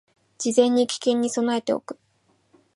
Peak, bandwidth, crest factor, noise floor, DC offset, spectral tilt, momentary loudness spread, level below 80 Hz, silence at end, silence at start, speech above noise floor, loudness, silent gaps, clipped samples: -4 dBFS; 11.5 kHz; 20 dB; -65 dBFS; under 0.1%; -3.5 dB/octave; 12 LU; -74 dBFS; 0.8 s; 0.4 s; 44 dB; -23 LUFS; none; under 0.1%